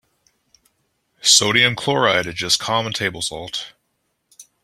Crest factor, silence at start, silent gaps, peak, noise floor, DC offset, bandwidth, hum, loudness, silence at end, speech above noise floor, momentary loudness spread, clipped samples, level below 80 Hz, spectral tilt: 22 dB; 1.25 s; none; 0 dBFS; -71 dBFS; under 0.1%; 16 kHz; none; -17 LUFS; 0.2 s; 52 dB; 16 LU; under 0.1%; -56 dBFS; -1.5 dB/octave